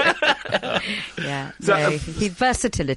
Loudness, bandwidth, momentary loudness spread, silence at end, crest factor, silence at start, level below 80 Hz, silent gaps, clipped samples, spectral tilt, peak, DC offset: -22 LUFS; 11.5 kHz; 8 LU; 0 s; 18 dB; 0 s; -40 dBFS; none; under 0.1%; -4 dB/octave; -4 dBFS; under 0.1%